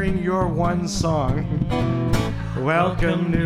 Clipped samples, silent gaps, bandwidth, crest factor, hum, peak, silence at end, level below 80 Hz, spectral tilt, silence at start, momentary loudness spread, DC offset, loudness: under 0.1%; none; 14.5 kHz; 14 dB; none; -6 dBFS; 0 s; -32 dBFS; -6.5 dB/octave; 0 s; 4 LU; under 0.1%; -22 LUFS